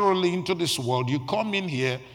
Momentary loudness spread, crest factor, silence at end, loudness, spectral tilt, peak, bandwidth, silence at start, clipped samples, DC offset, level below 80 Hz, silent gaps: 3 LU; 16 dB; 0 s; -25 LUFS; -5 dB/octave; -10 dBFS; 17 kHz; 0 s; under 0.1%; under 0.1%; -64 dBFS; none